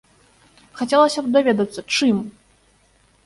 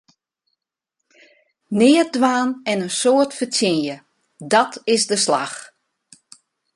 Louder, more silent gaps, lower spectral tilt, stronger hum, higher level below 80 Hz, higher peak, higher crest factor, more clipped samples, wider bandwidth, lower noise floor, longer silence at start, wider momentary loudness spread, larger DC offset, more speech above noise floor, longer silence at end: about the same, -19 LUFS vs -18 LUFS; neither; about the same, -4.5 dB/octave vs -3.5 dB/octave; neither; first, -60 dBFS vs -68 dBFS; about the same, -2 dBFS vs -2 dBFS; about the same, 18 dB vs 18 dB; neither; about the same, 11.5 kHz vs 11.5 kHz; second, -58 dBFS vs -81 dBFS; second, 0.75 s vs 1.7 s; second, 10 LU vs 14 LU; neither; second, 40 dB vs 63 dB; second, 0.95 s vs 1.1 s